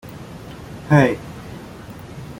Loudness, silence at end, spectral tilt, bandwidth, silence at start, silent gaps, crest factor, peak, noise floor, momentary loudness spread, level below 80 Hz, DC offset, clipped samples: -17 LUFS; 0.05 s; -7.5 dB/octave; 16.5 kHz; 0.05 s; none; 20 dB; -2 dBFS; -36 dBFS; 21 LU; -46 dBFS; under 0.1%; under 0.1%